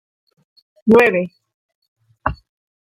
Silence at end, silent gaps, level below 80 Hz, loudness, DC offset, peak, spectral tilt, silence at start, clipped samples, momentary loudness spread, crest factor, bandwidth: 0.65 s; 1.54-1.69 s, 1.75-1.82 s, 1.88-1.96 s; -44 dBFS; -16 LUFS; under 0.1%; -2 dBFS; -7 dB/octave; 0.85 s; under 0.1%; 14 LU; 18 dB; 15.5 kHz